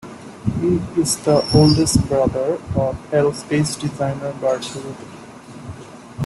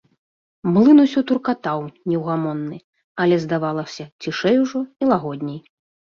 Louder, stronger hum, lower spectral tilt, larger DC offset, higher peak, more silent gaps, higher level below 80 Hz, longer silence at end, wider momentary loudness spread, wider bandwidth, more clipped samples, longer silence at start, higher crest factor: about the same, -19 LUFS vs -19 LUFS; neither; second, -5.5 dB/octave vs -7 dB/octave; neither; about the same, -2 dBFS vs -2 dBFS; second, none vs 2.84-2.93 s, 3.04-3.15 s, 4.12-4.19 s; first, -40 dBFS vs -62 dBFS; second, 0 s vs 0.55 s; first, 23 LU vs 17 LU; first, 12.5 kHz vs 7 kHz; neither; second, 0.05 s vs 0.65 s; about the same, 18 dB vs 16 dB